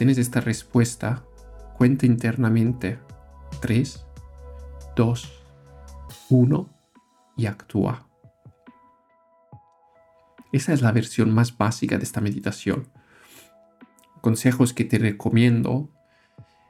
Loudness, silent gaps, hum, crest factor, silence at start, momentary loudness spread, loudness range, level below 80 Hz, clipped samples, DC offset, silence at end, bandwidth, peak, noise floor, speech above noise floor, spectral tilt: -23 LUFS; none; none; 18 dB; 0 s; 21 LU; 6 LU; -48 dBFS; under 0.1%; under 0.1%; 0.25 s; 14.5 kHz; -6 dBFS; -60 dBFS; 39 dB; -6.5 dB/octave